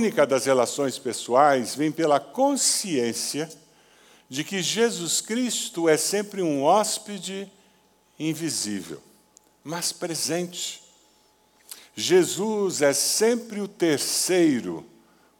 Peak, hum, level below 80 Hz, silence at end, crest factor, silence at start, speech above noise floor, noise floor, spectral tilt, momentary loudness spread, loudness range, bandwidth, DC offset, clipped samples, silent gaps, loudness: -6 dBFS; none; -78 dBFS; 0.55 s; 20 dB; 0 s; 37 dB; -61 dBFS; -3 dB/octave; 14 LU; 8 LU; 19 kHz; under 0.1%; under 0.1%; none; -23 LUFS